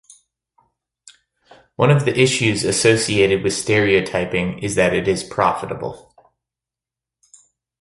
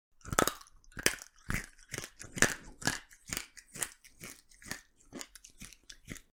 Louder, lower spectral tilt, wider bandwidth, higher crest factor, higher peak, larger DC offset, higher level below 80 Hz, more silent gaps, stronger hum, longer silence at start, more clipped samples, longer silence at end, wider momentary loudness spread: first, -17 LUFS vs -35 LUFS; first, -4.5 dB/octave vs -2 dB/octave; second, 11.5 kHz vs 17.5 kHz; second, 18 dB vs 36 dB; about the same, -2 dBFS vs -2 dBFS; neither; first, -48 dBFS vs -54 dBFS; neither; neither; first, 1.8 s vs 0.25 s; neither; first, 1.85 s vs 0.2 s; second, 7 LU vs 21 LU